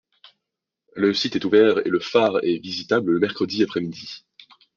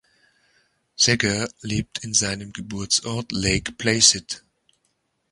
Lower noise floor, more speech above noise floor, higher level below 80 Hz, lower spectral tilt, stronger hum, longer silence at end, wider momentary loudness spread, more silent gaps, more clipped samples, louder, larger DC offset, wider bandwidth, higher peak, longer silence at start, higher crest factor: first, -84 dBFS vs -71 dBFS; first, 63 dB vs 48 dB; second, -66 dBFS vs -46 dBFS; first, -5.5 dB/octave vs -2 dB/octave; neither; second, 0.6 s vs 0.95 s; about the same, 17 LU vs 16 LU; neither; neither; about the same, -21 LUFS vs -21 LUFS; neither; second, 7.2 kHz vs 11.5 kHz; second, -4 dBFS vs 0 dBFS; about the same, 0.95 s vs 1 s; about the same, 20 dB vs 24 dB